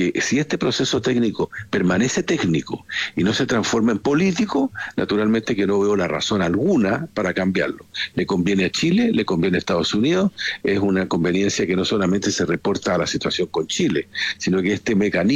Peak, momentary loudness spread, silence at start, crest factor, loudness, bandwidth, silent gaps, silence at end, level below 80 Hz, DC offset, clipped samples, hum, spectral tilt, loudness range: -8 dBFS; 5 LU; 0 s; 12 dB; -20 LUFS; 11 kHz; none; 0 s; -52 dBFS; under 0.1%; under 0.1%; none; -5 dB/octave; 1 LU